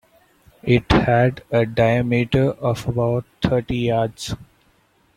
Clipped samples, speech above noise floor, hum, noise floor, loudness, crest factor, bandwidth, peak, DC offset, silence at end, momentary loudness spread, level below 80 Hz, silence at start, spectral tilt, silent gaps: under 0.1%; 41 dB; none; -60 dBFS; -20 LUFS; 20 dB; 13 kHz; 0 dBFS; under 0.1%; 0.7 s; 9 LU; -40 dBFS; 0.65 s; -7 dB/octave; none